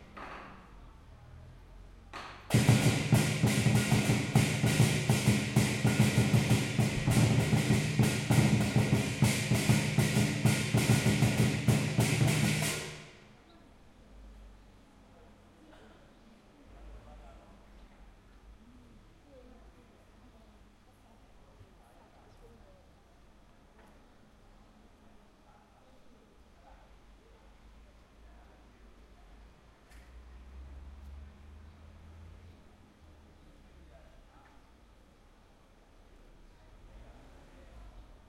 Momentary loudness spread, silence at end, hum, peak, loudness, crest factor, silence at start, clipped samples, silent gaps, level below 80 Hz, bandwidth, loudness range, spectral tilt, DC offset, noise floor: 24 LU; 0.25 s; none; -12 dBFS; -28 LUFS; 20 dB; 0 s; under 0.1%; none; -54 dBFS; 16.5 kHz; 5 LU; -5 dB/octave; under 0.1%; -60 dBFS